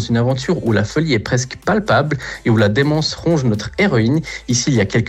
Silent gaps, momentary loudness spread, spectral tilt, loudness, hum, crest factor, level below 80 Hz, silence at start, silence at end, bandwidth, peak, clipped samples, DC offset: none; 5 LU; -5.5 dB/octave; -17 LUFS; none; 12 dB; -42 dBFS; 0 s; 0 s; 11 kHz; -4 dBFS; under 0.1%; under 0.1%